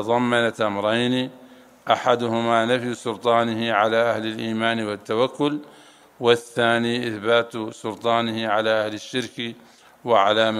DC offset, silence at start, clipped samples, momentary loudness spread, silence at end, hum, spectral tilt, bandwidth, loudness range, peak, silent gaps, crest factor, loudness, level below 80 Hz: under 0.1%; 0 s; under 0.1%; 10 LU; 0 s; none; -5 dB/octave; 14.5 kHz; 2 LU; -2 dBFS; none; 22 dB; -22 LUFS; -70 dBFS